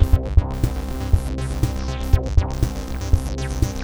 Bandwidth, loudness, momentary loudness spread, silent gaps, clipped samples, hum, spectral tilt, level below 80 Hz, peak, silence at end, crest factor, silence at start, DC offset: over 20 kHz; -23 LUFS; 7 LU; none; under 0.1%; none; -6.5 dB/octave; -22 dBFS; -2 dBFS; 0 s; 18 dB; 0 s; 0.2%